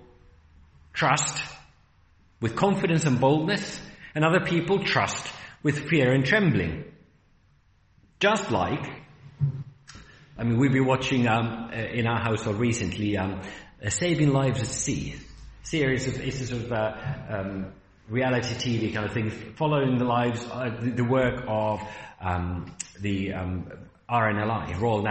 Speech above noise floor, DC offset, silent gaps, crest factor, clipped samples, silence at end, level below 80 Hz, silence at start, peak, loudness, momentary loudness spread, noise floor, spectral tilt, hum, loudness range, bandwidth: 36 dB; under 0.1%; none; 20 dB; under 0.1%; 0 s; -52 dBFS; 0.95 s; -8 dBFS; -26 LUFS; 14 LU; -62 dBFS; -5.5 dB/octave; none; 5 LU; 8.4 kHz